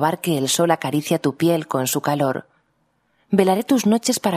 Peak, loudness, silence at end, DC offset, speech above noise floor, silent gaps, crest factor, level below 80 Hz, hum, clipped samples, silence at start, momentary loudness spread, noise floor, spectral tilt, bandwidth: -2 dBFS; -20 LUFS; 0 s; under 0.1%; 47 dB; none; 18 dB; -66 dBFS; none; under 0.1%; 0 s; 4 LU; -66 dBFS; -4.5 dB/octave; 15.5 kHz